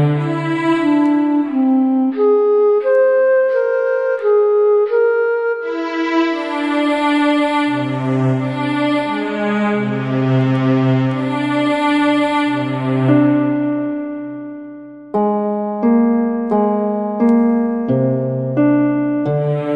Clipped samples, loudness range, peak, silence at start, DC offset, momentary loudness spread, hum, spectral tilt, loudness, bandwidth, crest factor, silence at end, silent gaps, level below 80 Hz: under 0.1%; 4 LU; -2 dBFS; 0 s; under 0.1%; 6 LU; none; -8 dB/octave; -16 LUFS; 10.5 kHz; 14 dB; 0 s; none; -60 dBFS